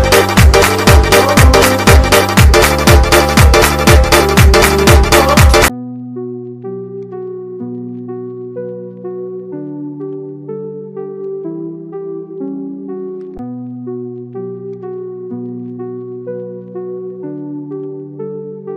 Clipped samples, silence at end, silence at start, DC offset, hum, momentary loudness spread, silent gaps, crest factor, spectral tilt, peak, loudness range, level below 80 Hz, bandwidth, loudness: 0.2%; 0 s; 0 s; under 0.1%; none; 18 LU; none; 12 dB; -4.5 dB/octave; 0 dBFS; 17 LU; -18 dBFS; 16 kHz; -8 LUFS